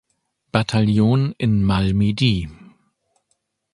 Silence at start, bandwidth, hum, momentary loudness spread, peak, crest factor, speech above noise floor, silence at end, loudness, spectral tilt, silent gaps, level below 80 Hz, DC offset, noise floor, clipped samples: 0.55 s; 11 kHz; none; 7 LU; 0 dBFS; 20 dB; 53 dB; 1.2 s; -19 LUFS; -7 dB/octave; none; -40 dBFS; under 0.1%; -71 dBFS; under 0.1%